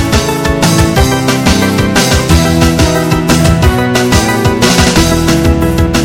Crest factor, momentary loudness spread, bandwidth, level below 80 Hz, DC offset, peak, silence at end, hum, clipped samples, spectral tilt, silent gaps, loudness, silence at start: 8 dB; 3 LU; 17 kHz; -18 dBFS; under 0.1%; 0 dBFS; 0 s; none; 0.8%; -4.5 dB/octave; none; -9 LUFS; 0 s